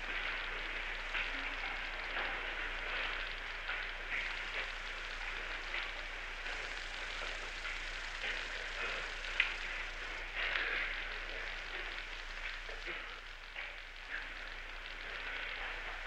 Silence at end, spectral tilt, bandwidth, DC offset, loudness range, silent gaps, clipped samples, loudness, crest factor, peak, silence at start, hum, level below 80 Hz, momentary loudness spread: 0 s; -1.5 dB/octave; 11.5 kHz; under 0.1%; 6 LU; none; under 0.1%; -40 LUFS; 26 dB; -14 dBFS; 0 s; none; -50 dBFS; 8 LU